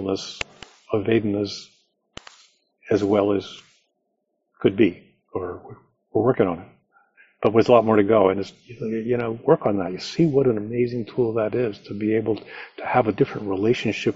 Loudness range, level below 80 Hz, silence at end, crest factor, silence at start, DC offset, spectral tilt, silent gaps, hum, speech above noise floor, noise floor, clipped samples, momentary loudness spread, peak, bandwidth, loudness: 5 LU; -58 dBFS; 0 s; 22 dB; 0 s; under 0.1%; -6 dB/octave; none; none; 53 dB; -75 dBFS; under 0.1%; 15 LU; -2 dBFS; 7.6 kHz; -22 LUFS